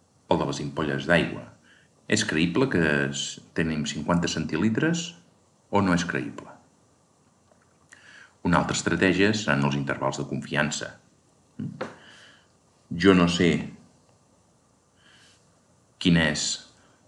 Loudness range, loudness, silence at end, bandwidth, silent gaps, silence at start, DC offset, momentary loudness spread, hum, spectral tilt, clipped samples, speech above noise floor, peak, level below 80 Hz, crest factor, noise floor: 4 LU; -25 LUFS; 0.45 s; 11.5 kHz; none; 0.3 s; under 0.1%; 14 LU; none; -4.5 dB/octave; under 0.1%; 38 dB; -4 dBFS; -54 dBFS; 22 dB; -63 dBFS